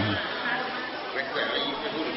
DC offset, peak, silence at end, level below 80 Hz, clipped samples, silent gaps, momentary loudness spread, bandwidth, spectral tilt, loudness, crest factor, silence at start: under 0.1%; -14 dBFS; 0 s; -60 dBFS; under 0.1%; none; 4 LU; 5.8 kHz; -8 dB/octave; -29 LUFS; 16 dB; 0 s